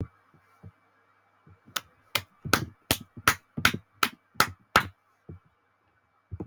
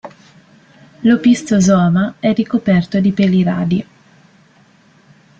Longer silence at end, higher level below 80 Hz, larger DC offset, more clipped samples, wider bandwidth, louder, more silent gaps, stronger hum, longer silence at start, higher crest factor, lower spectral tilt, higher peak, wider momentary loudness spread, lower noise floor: second, 0 s vs 1.55 s; about the same, -54 dBFS vs -50 dBFS; neither; neither; first, over 20 kHz vs 8.8 kHz; second, -28 LUFS vs -14 LUFS; neither; neither; about the same, 0 s vs 0.05 s; first, 28 dB vs 14 dB; second, -2.5 dB/octave vs -6.5 dB/octave; about the same, -4 dBFS vs -2 dBFS; first, 11 LU vs 6 LU; first, -69 dBFS vs -50 dBFS